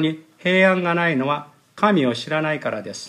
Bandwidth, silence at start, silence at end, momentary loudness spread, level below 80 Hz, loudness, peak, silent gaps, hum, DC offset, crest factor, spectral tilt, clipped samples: 11.5 kHz; 0 s; 0 s; 10 LU; -70 dBFS; -20 LUFS; -2 dBFS; none; none; under 0.1%; 18 dB; -6 dB/octave; under 0.1%